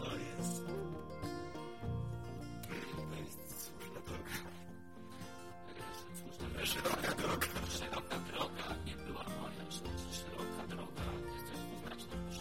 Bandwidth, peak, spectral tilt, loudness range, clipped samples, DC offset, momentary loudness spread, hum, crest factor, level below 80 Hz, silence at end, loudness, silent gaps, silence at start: 16.5 kHz; -22 dBFS; -4 dB/octave; 8 LU; under 0.1%; 0.2%; 13 LU; none; 22 dB; -56 dBFS; 0 s; -43 LUFS; none; 0 s